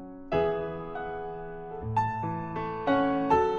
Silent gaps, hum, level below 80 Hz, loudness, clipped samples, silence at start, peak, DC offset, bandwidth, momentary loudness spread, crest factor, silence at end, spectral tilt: none; none; -50 dBFS; -30 LUFS; under 0.1%; 0 s; -10 dBFS; under 0.1%; 7.6 kHz; 13 LU; 20 dB; 0 s; -8 dB/octave